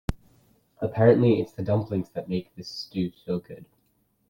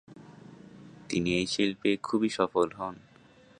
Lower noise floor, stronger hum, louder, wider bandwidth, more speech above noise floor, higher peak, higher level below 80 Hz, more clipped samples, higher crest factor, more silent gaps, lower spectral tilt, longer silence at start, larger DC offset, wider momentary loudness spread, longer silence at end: first, -69 dBFS vs -57 dBFS; neither; first, -26 LUFS vs -29 LUFS; first, 16 kHz vs 10.5 kHz; first, 44 dB vs 29 dB; first, -6 dBFS vs -10 dBFS; first, -48 dBFS vs -60 dBFS; neither; about the same, 20 dB vs 22 dB; neither; first, -8 dB/octave vs -5 dB/octave; about the same, 0.1 s vs 0.1 s; neither; second, 18 LU vs 23 LU; about the same, 0.65 s vs 0.6 s